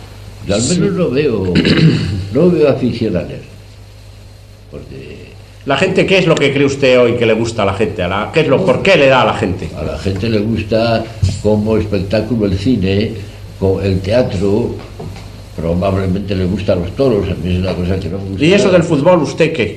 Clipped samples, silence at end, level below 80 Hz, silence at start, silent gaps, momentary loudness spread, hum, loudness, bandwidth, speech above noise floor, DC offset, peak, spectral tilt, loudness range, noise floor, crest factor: under 0.1%; 0 s; -34 dBFS; 0 s; none; 18 LU; none; -13 LUFS; 13 kHz; 23 dB; under 0.1%; 0 dBFS; -6 dB/octave; 5 LU; -36 dBFS; 14 dB